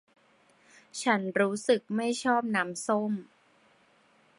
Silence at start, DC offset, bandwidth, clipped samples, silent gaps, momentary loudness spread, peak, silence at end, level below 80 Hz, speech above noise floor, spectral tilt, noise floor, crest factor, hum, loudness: 0.95 s; under 0.1%; 11.5 kHz; under 0.1%; none; 7 LU; -10 dBFS; 1.15 s; -78 dBFS; 36 dB; -4.5 dB/octave; -64 dBFS; 20 dB; none; -29 LUFS